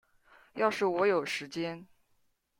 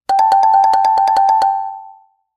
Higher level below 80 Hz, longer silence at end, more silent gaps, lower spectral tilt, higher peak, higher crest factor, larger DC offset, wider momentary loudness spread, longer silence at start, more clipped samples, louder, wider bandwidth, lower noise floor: second, -76 dBFS vs -58 dBFS; first, 0.75 s vs 0.45 s; neither; first, -4.5 dB/octave vs -1.5 dB/octave; second, -14 dBFS vs -2 dBFS; first, 20 dB vs 12 dB; neither; first, 15 LU vs 8 LU; first, 0.55 s vs 0.1 s; neither; second, -31 LUFS vs -12 LUFS; first, 16.5 kHz vs 11.5 kHz; first, -72 dBFS vs -44 dBFS